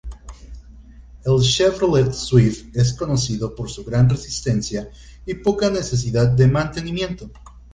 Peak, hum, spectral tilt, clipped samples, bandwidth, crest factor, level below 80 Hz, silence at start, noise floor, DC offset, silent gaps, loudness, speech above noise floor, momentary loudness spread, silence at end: -2 dBFS; none; -6 dB/octave; under 0.1%; 9.6 kHz; 18 dB; -38 dBFS; 0.05 s; -42 dBFS; under 0.1%; none; -19 LUFS; 23 dB; 16 LU; 0.15 s